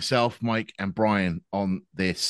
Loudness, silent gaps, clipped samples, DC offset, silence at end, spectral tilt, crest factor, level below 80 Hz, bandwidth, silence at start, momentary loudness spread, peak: -26 LUFS; none; under 0.1%; under 0.1%; 0 s; -5 dB/octave; 18 dB; -56 dBFS; 12.5 kHz; 0 s; 6 LU; -8 dBFS